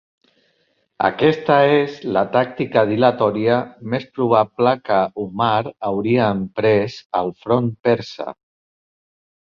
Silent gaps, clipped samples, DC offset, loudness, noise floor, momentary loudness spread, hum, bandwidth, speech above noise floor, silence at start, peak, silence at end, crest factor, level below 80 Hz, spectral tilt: 7.05-7.10 s; under 0.1%; under 0.1%; -18 LUFS; -65 dBFS; 8 LU; none; 7 kHz; 47 dB; 1 s; 0 dBFS; 1.2 s; 18 dB; -56 dBFS; -7.5 dB/octave